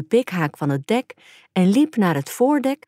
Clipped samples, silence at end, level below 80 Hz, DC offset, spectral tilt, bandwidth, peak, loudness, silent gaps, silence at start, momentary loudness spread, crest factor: under 0.1%; 0.15 s; -72 dBFS; under 0.1%; -6.5 dB/octave; 16 kHz; -6 dBFS; -20 LUFS; none; 0 s; 7 LU; 14 dB